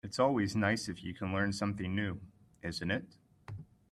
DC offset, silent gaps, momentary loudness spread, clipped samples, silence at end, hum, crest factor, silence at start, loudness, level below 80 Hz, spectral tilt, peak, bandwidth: under 0.1%; none; 18 LU; under 0.1%; 0.25 s; none; 20 dB; 0.05 s; -35 LUFS; -64 dBFS; -5.5 dB/octave; -16 dBFS; 13 kHz